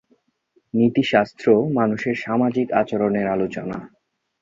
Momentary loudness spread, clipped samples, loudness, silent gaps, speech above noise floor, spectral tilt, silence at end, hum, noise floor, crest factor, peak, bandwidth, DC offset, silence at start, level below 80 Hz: 9 LU; under 0.1%; -20 LUFS; none; 45 dB; -7.5 dB/octave; 0.55 s; none; -64 dBFS; 18 dB; -2 dBFS; 7.4 kHz; under 0.1%; 0.75 s; -58 dBFS